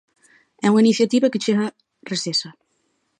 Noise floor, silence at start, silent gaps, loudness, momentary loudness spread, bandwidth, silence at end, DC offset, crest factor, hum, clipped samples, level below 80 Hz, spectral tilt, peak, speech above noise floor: -69 dBFS; 0.65 s; none; -20 LUFS; 12 LU; 10 kHz; 0.7 s; under 0.1%; 14 dB; none; under 0.1%; -72 dBFS; -4.5 dB/octave; -6 dBFS; 50 dB